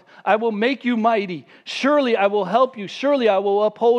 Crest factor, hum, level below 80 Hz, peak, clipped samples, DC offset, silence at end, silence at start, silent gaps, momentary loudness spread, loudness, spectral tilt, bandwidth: 16 dB; none; -78 dBFS; -4 dBFS; under 0.1%; under 0.1%; 0 s; 0.25 s; none; 6 LU; -19 LUFS; -5.5 dB/octave; 9.6 kHz